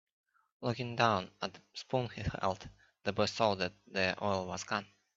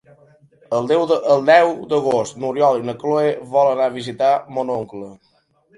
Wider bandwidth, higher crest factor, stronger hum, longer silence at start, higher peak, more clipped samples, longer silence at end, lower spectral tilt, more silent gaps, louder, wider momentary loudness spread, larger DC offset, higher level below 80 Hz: second, 8 kHz vs 11.5 kHz; first, 24 dB vs 18 dB; neither; about the same, 0.6 s vs 0.7 s; second, -10 dBFS vs 0 dBFS; neither; second, 0.3 s vs 0.65 s; about the same, -5 dB/octave vs -5.5 dB/octave; neither; second, -35 LUFS vs -18 LUFS; about the same, 11 LU vs 11 LU; neither; about the same, -60 dBFS vs -64 dBFS